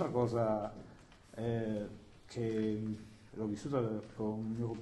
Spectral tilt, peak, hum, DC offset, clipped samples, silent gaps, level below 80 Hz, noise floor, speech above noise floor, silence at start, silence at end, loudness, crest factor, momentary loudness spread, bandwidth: -8 dB/octave; -20 dBFS; none; under 0.1%; under 0.1%; none; -62 dBFS; -57 dBFS; 21 dB; 0 s; 0 s; -38 LUFS; 18 dB; 16 LU; 11.5 kHz